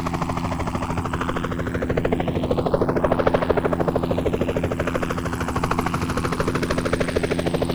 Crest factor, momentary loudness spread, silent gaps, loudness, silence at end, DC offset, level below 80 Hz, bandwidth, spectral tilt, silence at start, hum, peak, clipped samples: 20 dB; 5 LU; none; -23 LUFS; 0 s; under 0.1%; -36 dBFS; over 20 kHz; -6.5 dB/octave; 0 s; none; -2 dBFS; under 0.1%